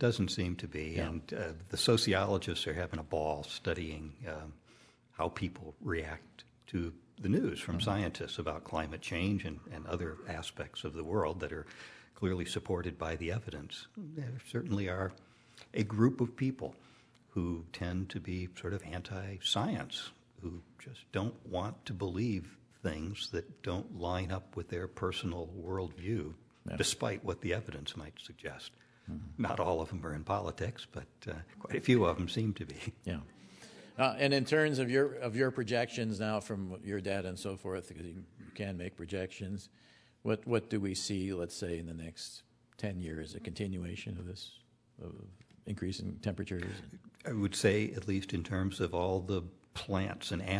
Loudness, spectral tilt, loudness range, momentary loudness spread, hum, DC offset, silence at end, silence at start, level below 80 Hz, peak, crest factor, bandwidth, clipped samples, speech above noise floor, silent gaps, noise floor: -37 LUFS; -5.5 dB/octave; 8 LU; 16 LU; none; under 0.1%; 0 s; 0 s; -56 dBFS; -12 dBFS; 24 dB; 11 kHz; under 0.1%; 27 dB; none; -63 dBFS